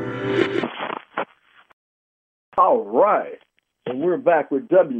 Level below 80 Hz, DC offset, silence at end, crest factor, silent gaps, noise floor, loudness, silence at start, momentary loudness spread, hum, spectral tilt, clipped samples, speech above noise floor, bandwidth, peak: -66 dBFS; under 0.1%; 0 s; 18 dB; 1.73-2.52 s; -55 dBFS; -21 LUFS; 0 s; 13 LU; none; -7.5 dB/octave; under 0.1%; 36 dB; 8 kHz; -4 dBFS